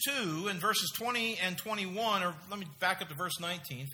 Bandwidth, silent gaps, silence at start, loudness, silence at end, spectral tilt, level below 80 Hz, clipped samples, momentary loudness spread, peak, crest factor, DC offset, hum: over 20 kHz; none; 0 s; -33 LUFS; 0 s; -2.5 dB/octave; -76 dBFS; under 0.1%; 7 LU; -14 dBFS; 20 dB; under 0.1%; none